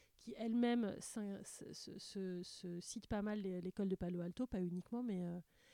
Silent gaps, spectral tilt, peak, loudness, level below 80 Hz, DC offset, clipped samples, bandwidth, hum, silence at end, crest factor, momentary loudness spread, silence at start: none; -6 dB/octave; -26 dBFS; -44 LUFS; -66 dBFS; under 0.1%; under 0.1%; 15.5 kHz; none; 0.3 s; 18 dB; 13 LU; 0.2 s